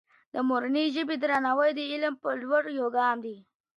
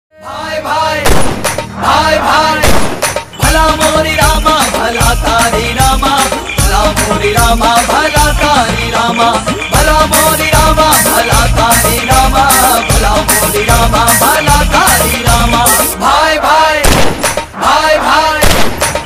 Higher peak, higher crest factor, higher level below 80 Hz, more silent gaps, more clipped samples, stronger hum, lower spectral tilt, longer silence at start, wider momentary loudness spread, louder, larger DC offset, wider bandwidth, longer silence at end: second, -12 dBFS vs 0 dBFS; first, 16 dB vs 8 dB; second, -78 dBFS vs -18 dBFS; neither; second, under 0.1% vs 0.2%; neither; first, -4.5 dB/octave vs -3 dB/octave; first, 0.35 s vs 0.15 s; about the same, 7 LU vs 5 LU; second, -28 LUFS vs -9 LUFS; neither; second, 11 kHz vs 16 kHz; first, 0.35 s vs 0 s